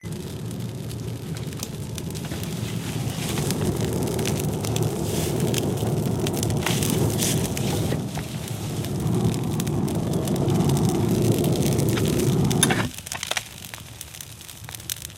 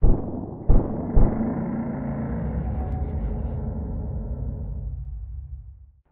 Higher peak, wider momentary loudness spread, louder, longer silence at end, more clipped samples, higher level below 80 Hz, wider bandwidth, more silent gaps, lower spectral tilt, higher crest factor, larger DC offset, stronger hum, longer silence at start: about the same, -4 dBFS vs -6 dBFS; about the same, 11 LU vs 13 LU; first, -25 LUFS vs -28 LUFS; second, 0 s vs 0.25 s; neither; second, -42 dBFS vs -26 dBFS; first, 17 kHz vs 2.3 kHz; neither; second, -5 dB/octave vs -14 dB/octave; about the same, 20 dB vs 18 dB; neither; neither; about the same, 0.05 s vs 0 s